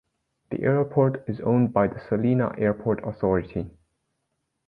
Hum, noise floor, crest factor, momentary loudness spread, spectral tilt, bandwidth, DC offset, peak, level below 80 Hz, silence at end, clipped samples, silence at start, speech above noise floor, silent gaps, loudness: none; -77 dBFS; 18 dB; 10 LU; -11.5 dB/octave; 4.8 kHz; under 0.1%; -6 dBFS; -50 dBFS; 1 s; under 0.1%; 0.5 s; 54 dB; none; -24 LUFS